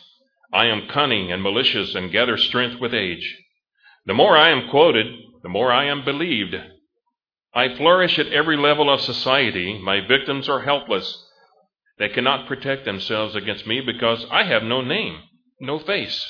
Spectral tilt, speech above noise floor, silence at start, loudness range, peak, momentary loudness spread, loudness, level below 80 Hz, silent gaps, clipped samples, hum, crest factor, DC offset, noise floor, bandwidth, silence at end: -5.5 dB/octave; 58 dB; 0.55 s; 5 LU; 0 dBFS; 11 LU; -19 LUFS; -60 dBFS; none; under 0.1%; none; 20 dB; under 0.1%; -78 dBFS; 5.4 kHz; 0 s